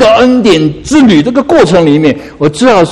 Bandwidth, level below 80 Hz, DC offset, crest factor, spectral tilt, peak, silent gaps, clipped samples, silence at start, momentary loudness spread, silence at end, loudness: 11.5 kHz; -34 dBFS; under 0.1%; 6 dB; -5.5 dB/octave; 0 dBFS; none; 3%; 0 s; 5 LU; 0 s; -7 LUFS